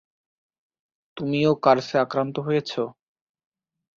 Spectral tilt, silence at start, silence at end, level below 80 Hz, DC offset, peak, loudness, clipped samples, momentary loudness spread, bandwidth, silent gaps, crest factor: -6.5 dB/octave; 1.15 s; 1.05 s; -66 dBFS; under 0.1%; -4 dBFS; -23 LUFS; under 0.1%; 11 LU; 7.4 kHz; none; 22 dB